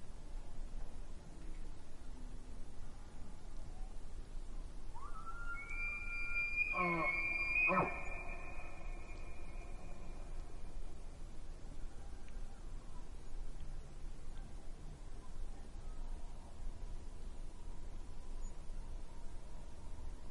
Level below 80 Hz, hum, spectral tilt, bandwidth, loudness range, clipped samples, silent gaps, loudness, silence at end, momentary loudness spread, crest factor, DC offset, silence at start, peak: -46 dBFS; none; -5.5 dB/octave; 11 kHz; 18 LU; under 0.1%; none; -43 LUFS; 0 s; 20 LU; 20 dB; under 0.1%; 0 s; -22 dBFS